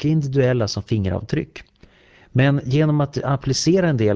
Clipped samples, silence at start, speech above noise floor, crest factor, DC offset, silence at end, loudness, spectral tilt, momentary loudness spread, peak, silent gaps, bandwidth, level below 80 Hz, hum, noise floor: under 0.1%; 0 s; 33 dB; 14 dB; under 0.1%; 0 s; -20 LUFS; -6.5 dB/octave; 7 LU; -6 dBFS; none; 8 kHz; -42 dBFS; none; -51 dBFS